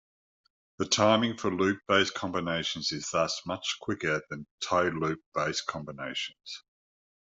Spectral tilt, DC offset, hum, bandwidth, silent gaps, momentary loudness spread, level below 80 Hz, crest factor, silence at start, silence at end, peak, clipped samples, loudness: -3.5 dB/octave; under 0.1%; none; 8.2 kHz; 4.51-4.58 s, 5.26-5.32 s; 12 LU; -66 dBFS; 22 dB; 0.8 s; 0.8 s; -10 dBFS; under 0.1%; -29 LUFS